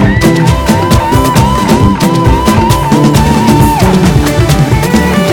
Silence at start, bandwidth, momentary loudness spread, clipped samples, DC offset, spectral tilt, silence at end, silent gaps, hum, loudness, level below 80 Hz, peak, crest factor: 0 s; 19.5 kHz; 2 LU; 0.6%; under 0.1%; -6 dB/octave; 0 s; none; none; -8 LUFS; -18 dBFS; 0 dBFS; 6 dB